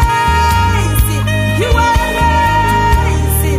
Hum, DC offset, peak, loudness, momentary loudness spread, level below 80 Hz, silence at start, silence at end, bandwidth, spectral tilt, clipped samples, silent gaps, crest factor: none; under 0.1%; 0 dBFS; -12 LUFS; 2 LU; -18 dBFS; 0 s; 0 s; 16 kHz; -5 dB/octave; under 0.1%; none; 10 dB